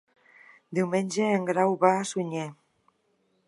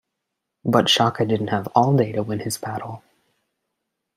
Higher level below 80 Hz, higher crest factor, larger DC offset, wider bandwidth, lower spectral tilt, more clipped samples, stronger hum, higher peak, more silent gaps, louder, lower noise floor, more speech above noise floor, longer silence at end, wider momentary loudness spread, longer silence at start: second, -80 dBFS vs -62 dBFS; about the same, 22 dB vs 20 dB; neither; second, 11.5 kHz vs 15.5 kHz; about the same, -5.5 dB/octave vs -5 dB/octave; neither; neither; second, -6 dBFS vs -2 dBFS; neither; second, -26 LUFS vs -21 LUFS; second, -71 dBFS vs -80 dBFS; second, 45 dB vs 60 dB; second, 0.95 s vs 1.2 s; second, 11 LU vs 14 LU; about the same, 0.7 s vs 0.65 s